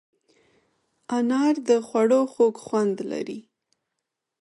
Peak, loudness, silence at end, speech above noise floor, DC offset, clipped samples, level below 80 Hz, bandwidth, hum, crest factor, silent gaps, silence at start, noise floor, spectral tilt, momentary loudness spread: -8 dBFS; -23 LUFS; 1 s; 60 dB; under 0.1%; under 0.1%; -76 dBFS; 11.5 kHz; none; 16 dB; none; 1.1 s; -83 dBFS; -5.5 dB/octave; 11 LU